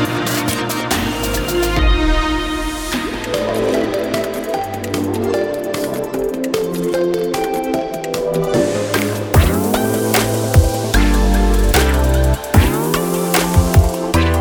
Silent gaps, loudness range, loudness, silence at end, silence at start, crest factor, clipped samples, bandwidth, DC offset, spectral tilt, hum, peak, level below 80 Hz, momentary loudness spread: none; 5 LU; -17 LUFS; 0 s; 0 s; 16 dB; under 0.1%; over 20 kHz; under 0.1%; -5 dB/octave; none; 0 dBFS; -22 dBFS; 7 LU